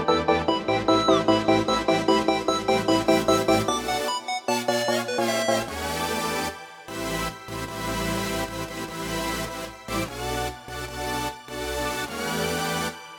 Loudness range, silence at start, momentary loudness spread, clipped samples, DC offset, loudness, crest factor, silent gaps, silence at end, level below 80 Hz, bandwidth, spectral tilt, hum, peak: 8 LU; 0 s; 11 LU; under 0.1%; under 0.1%; -25 LUFS; 20 dB; none; 0 s; -46 dBFS; over 20 kHz; -4 dB/octave; none; -6 dBFS